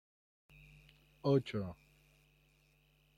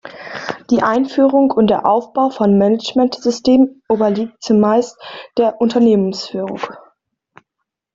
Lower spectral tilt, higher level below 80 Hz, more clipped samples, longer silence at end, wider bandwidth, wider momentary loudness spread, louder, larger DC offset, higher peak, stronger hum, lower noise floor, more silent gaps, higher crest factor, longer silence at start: first, -8 dB/octave vs -6.5 dB/octave; second, -70 dBFS vs -56 dBFS; neither; first, 1.45 s vs 1.15 s; first, 13.5 kHz vs 7.6 kHz; first, 26 LU vs 13 LU; second, -37 LUFS vs -15 LUFS; neither; second, -20 dBFS vs 0 dBFS; neither; second, -71 dBFS vs -77 dBFS; neither; first, 22 dB vs 16 dB; first, 1.25 s vs 0.05 s